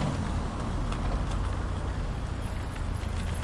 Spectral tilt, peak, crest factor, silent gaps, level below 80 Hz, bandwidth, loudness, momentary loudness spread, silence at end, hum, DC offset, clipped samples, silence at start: -6.5 dB/octave; -18 dBFS; 14 dB; none; -34 dBFS; 11.5 kHz; -33 LUFS; 3 LU; 0 s; none; under 0.1%; under 0.1%; 0 s